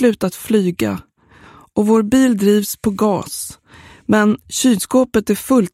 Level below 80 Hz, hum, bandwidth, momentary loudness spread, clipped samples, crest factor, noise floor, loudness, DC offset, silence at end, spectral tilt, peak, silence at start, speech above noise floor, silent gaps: -48 dBFS; none; 16.5 kHz; 11 LU; under 0.1%; 16 dB; -45 dBFS; -16 LUFS; under 0.1%; 0.05 s; -5 dB/octave; 0 dBFS; 0 s; 30 dB; none